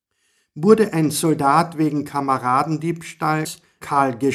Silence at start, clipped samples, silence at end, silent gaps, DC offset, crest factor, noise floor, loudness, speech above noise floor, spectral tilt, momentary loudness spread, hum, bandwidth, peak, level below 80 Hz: 0.55 s; under 0.1%; 0 s; none; under 0.1%; 18 dB; -67 dBFS; -19 LUFS; 48 dB; -6 dB/octave; 9 LU; none; 15.5 kHz; 0 dBFS; -62 dBFS